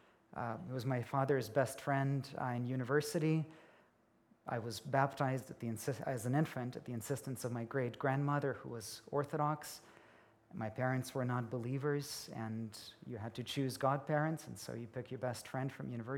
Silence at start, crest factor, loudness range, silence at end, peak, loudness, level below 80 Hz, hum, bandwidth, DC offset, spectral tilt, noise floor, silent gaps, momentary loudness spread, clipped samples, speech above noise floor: 0.3 s; 22 dB; 3 LU; 0 s; -18 dBFS; -39 LUFS; -78 dBFS; none; 17.5 kHz; under 0.1%; -6 dB/octave; -71 dBFS; none; 11 LU; under 0.1%; 33 dB